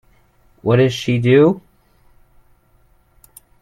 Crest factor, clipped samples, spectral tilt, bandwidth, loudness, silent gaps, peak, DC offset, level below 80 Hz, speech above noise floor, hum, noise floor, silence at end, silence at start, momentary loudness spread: 18 dB; under 0.1%; -7 dB/octave; 16.5 kHz; -15 LUFS; none; -2 dBFS; under 0.1%; -52 dBFS; 41 dB; none; -55 dBFS; 2 s; 0.65 s; 12 LU